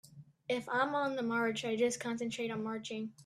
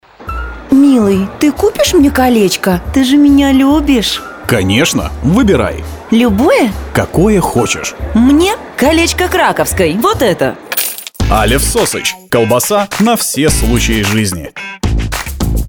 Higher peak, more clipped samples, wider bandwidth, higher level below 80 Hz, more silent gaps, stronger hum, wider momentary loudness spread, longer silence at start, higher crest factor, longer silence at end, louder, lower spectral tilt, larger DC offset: second, -20 dBFS vs 0 dBFS; neither; second, 13.5 kHz vs over 20 kHz; second, -78 dBFS vs -24 dBFS; neither; neither; about the same, 7 LU vs 9 LU; about the same, 0.15 s vs 0.2 s; first, 16 dB vs 10 dB; about the same, 0 s vs 0 s; second, -35 LUFS vs -11 LUFS; about the same, -4 dB/octave vs -4.5 dB/octave; neither